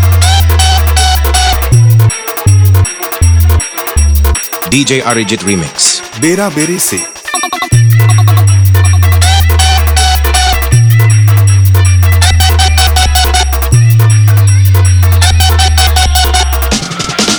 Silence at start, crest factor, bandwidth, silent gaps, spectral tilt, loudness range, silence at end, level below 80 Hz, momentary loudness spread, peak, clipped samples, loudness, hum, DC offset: 0 s; 6 dB; over 20 kHz; none; -4 dB/octave; 3 LU; 0 s; -14 dBFS; 5 LU; 0 dBFS; under 0.1%; -8 LUFS; none; under 0.1%